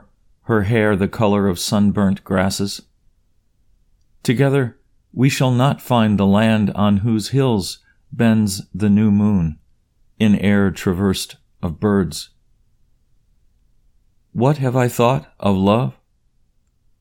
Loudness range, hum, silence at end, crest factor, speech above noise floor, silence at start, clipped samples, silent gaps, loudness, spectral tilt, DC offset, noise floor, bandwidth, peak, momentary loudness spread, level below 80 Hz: 6 LU; none; 1.1 s; 18 dB; 43 dB; 0.5 s; under 0.1%; none; -18 LUFS; -6.5 dB/octave; under 0.1%; -60 dBFS; 17.5 kHz; -2 dBFS; 11 LU; -46 dBFS